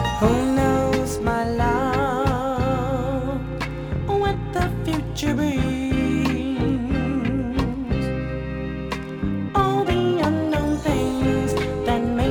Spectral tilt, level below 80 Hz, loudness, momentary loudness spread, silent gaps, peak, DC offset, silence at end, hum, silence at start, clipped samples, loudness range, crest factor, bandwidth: -6.5 dB/octave; -34 dBFS; -23 LUFS; 7 LU; none; -4 dBFS; under 0.1%; 0 s; none; 0 s; under 0.1%; 2 LU; 18 dB; 20 kHz